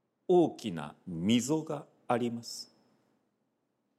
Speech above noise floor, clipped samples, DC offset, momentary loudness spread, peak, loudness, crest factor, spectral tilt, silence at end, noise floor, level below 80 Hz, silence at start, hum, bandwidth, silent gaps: 48 dB; under 0.1%; under 0.1%; 15 LU; -14 dBFS; -32 LUFS; 18 dB; -5.5 dB/octave; 1.35 s; -79 dBFS; -72 dBFS; 0.3 s; none; 14.5 kHz; none